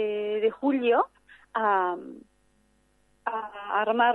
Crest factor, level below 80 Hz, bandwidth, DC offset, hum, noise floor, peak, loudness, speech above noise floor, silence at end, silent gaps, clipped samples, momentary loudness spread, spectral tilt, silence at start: 18 dB; -72 dBFS; 4.2 kHz; under 0.1%; none; -66 dBFS; -10 dBFS; -27 LUFS; 41 dB; 0 s; none; under 0.1%; 12 LU; -6.5 dB/octave; 0 s